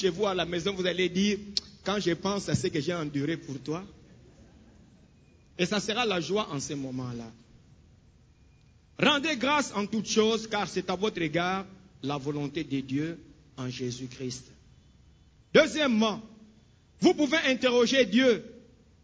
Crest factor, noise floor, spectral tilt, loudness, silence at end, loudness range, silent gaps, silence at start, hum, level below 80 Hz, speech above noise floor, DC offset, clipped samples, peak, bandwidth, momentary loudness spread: 22 dB; -59 dBFS; -4.5 dB/octave; -28 LUFS; 0.45 s; 9 LU; none; 0 s; none; -60 dBFS; 31 dB; under 0.1%; under 0.1%; -8 dBFS; 8 kHz; 14 LU